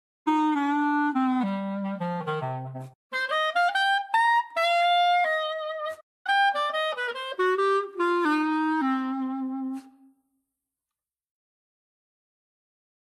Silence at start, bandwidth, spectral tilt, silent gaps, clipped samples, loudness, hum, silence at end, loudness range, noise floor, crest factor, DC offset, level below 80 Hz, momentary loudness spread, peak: 0.25 s; 13 kHz; -5 dB/octave; 2.95-3.10 s, 6.03-6.25 s; under 0.1%; -25 LUFS; none; 3.2 s; 8 LU; under -90 dBFS; 14 dB; under 0.1%; -84 dBFS; 11 LU; -12 dBFS